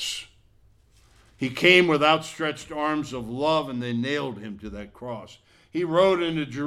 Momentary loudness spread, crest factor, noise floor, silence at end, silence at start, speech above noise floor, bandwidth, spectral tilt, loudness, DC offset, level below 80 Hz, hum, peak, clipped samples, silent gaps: 20 LU; 22 dB; -58 dBFS; 0 s; 0 s; 34 dB; 14 kHz; -4.5 dB/octave; -23 LUFS; under 0.1%; -56 dBFS; none; -2 dBFS; under 0.1%; none